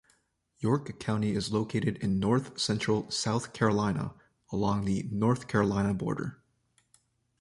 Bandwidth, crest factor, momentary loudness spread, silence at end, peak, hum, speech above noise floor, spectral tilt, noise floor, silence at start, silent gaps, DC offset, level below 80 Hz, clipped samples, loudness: 11.5 kHz; 20 dB; 7 LU; 1.05 s; -10 dBFS; none; 42 dB; -6 dB/octave; -71 dBFS; 0.6 s; none; under 0.1%; -54 dBFS; under 0.1%; -30 LUFS